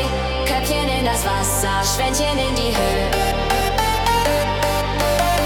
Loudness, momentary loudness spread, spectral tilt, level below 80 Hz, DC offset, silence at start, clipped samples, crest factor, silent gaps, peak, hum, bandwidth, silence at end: -19 LUFS; 2 LU; -3.5 dB/octave; -26 dBFS; under 0.1%; 0 s; under 0.1%; 14 dB; none; -6 dBFS; none; 18 kHz; 0 s